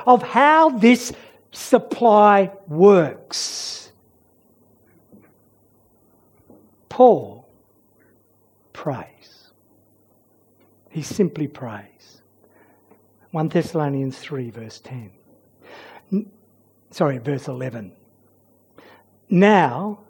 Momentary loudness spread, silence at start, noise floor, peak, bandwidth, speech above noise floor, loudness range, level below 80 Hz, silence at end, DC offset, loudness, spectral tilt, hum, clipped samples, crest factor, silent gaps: 23 LU; 0 s; -59 dBFS; 0 dBFS; 18 kHz; 42 dB; 15 LU; -68 dBFS; 0.15 s; under 0.1%; -18 LUFS; -5.5 dB/octave; none; under 0.1%; 20 dB; none